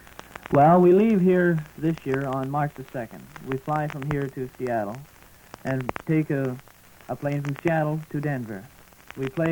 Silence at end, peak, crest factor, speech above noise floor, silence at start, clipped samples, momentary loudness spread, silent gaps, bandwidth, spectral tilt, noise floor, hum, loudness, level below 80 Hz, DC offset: 0 s; -6 dBFS; 18 dB; 24 dB; 0.3 s; under 0.1%; 19 LU; none; 19 kHz; -8.5 dB/octave; -48 dBFS; none; -24 LUFS; -54 dBFS; under 0.1%